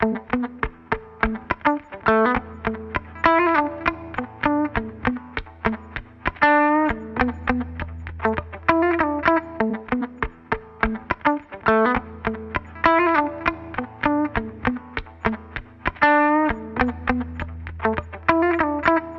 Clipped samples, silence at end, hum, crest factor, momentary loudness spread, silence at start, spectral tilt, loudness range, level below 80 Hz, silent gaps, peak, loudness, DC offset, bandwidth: under 0.1%; 0 s; none; 20 dB; 13 LU; 0 s; -8 dB/octave; 2 LU; -40 dBFS; none; -2 dBFS; -22 LUFS; under 0.1%; 6.2 kHz